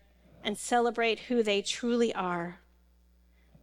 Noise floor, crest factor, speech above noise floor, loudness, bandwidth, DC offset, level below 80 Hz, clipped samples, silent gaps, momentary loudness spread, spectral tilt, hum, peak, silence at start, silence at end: -63 dBFS; 18 dB; 34 dB; -30 LUFS; 15.5 kHz; under 0.1%; -64 dBFS; under 0.1%; none; 9 LU; -3.5 dB/octave; none; -14 dBFS; 0.45 s; 1.05 s